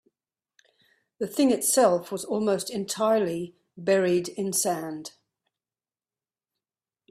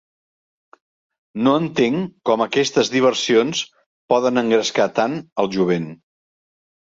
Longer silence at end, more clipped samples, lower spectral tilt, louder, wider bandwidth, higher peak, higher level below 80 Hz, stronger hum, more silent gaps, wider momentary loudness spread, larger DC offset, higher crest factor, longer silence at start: first, 2 s vs 1 s; neither; about the same, -4 dB/octave vs -4.5 dB/octave; second, -25 LUFS vs -19 LUFS; first, 15.5 kHz vs 8 kHz; second, -8 dBFS vs -2 dBFS; second, -70 dBFS vs -62 dBFS; neither; second, none vs 3.86-4.09 s, 5.32-5.36 s; first, 14 LU vs 6 LU; neither; about the same, 20 dB vs 18 dB; second, 1.2 s vs 1.35 s